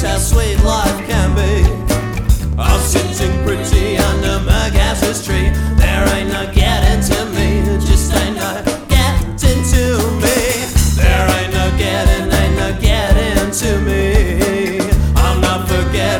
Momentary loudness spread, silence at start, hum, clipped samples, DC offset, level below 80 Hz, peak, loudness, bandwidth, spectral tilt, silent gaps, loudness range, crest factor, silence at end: 3 LU; 0 s; none; under 0.1%; under 0.1%; -16 dBFS; 0 dBFS; -14 LUFS; 18 kHz; -5 dB/octave; none; 1 LU; 12 dB; 0 s